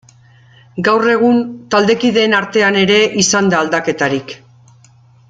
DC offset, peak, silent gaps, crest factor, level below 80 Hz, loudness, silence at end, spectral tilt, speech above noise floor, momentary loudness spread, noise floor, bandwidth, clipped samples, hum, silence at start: under 0.1%; 0 dBFS; none; 14 dB; -56 dBFS; -13 LUFS; 0.95 s; -3.5 dB/octave; 33 dB; 8 LU; -46 dBFS; 9.4 kHz; under 0.1%; none; 0.75 s